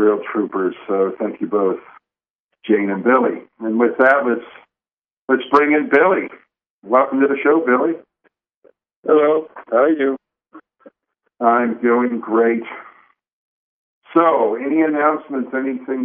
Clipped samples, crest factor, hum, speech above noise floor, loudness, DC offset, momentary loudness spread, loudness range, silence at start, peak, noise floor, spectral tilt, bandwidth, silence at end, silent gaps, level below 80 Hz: under 0.1%; 18 dB; none; over 73 dB; -17 LUFS; under 0.1%; 10 LU; 3 LU; 0 s; 0 dBFS; under -90 dBFS; -4.5 dB/octave; 5.4 kHz; 0 s; 2.30-2.49 s, 4.93-4.97 s, 5.12-5.28 s, 6.70-6.82 s, 8.56-8.62 s, 8.96-9.03 s, 13.33-14.02 s; -70 dBFS